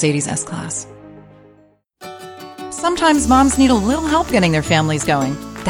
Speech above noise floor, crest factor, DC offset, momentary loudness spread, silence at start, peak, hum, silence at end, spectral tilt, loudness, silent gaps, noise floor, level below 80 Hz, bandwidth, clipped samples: 37 dB; 16 dB; under 0.1%; 21 LU; 0 s; -2 dBFS; none; 0 s; -4.5 dB/octave; -16 LUFS; none; -52 dBFS; -36 dBFS; 17.5 kHz; under 0.1%